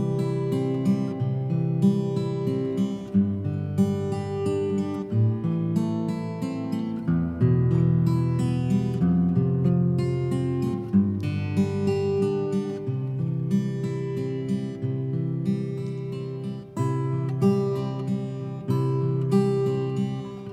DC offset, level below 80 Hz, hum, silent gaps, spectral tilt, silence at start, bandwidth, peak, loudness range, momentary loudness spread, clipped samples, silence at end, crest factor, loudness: under 0.1%; -52 dBFS; none; none; -9 dB/octave; 0 s; 10 kHz; -10 dBFS; 5 LU; 7 LU; under 0.1%; 0 s; 14 dB; -25 LUFS